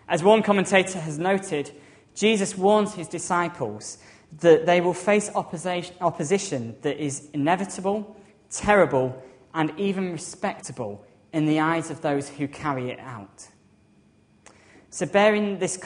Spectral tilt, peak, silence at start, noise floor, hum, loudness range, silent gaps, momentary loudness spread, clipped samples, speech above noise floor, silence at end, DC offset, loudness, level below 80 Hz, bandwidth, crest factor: -5 dB/octave; -4 dBFS; 0.1 s; -59 dBFS; none; 5 LU; none; 16 LU; under 0.1%; 35 dB; 0 s; under 0.1%; -24 LUFS; -60 dBFS; 10.5 kHz; 22 dB